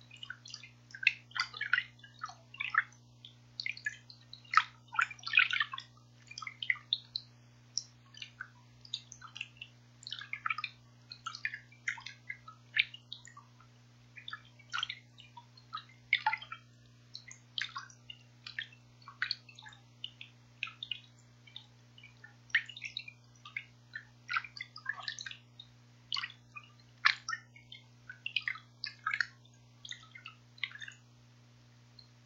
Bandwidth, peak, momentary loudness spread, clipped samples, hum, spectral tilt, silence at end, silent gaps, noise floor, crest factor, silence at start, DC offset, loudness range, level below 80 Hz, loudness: 16.5 kHz; -8 dBFS; 22 LU; under 0.1%; 60 Hz at -60 dBFS; -0.5 dB/octave; 0.25 s; none; -61 dBFS; 32 dB; 0 s; under 0.1%; 10 LU; -78 dBFS; -37 LUFS